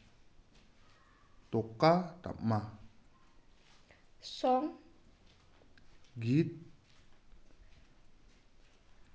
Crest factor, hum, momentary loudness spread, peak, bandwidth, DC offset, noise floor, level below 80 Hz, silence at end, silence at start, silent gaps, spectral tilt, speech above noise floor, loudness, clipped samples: 24 dB; none; 24 LU; -14 dBFS; 8 kHz; under 0.1%; -62 dBFS; -64 dBFS; 2.4 s; 1.5 s; none; -7.5 dB/octave; 30 dB; -34 LUFS; under 0.1%